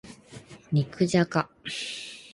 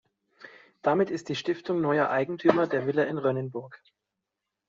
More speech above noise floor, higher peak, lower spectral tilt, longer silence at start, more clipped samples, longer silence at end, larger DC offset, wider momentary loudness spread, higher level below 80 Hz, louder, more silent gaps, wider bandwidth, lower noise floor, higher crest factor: second, 22 dB vs 59 dB; second, -8 dBFS vs -4 dBFS; about the same, -5.5 dB/octave vs -5 dB/octave; second, 0.05 s vs 0.45 s; neither; second, 0.05 s vs 0.9 s; neither; first, 23 LU vs 7 LU; first, -62 dBFS vs -72 dBFS; about the same, -28 LUFS vs -27 LUFS; neither; first, 11.5 kHz vs 7.6 kHz; second, -48 dBFS vs -85 dBFS; about the same, 20 dB vs 24 dB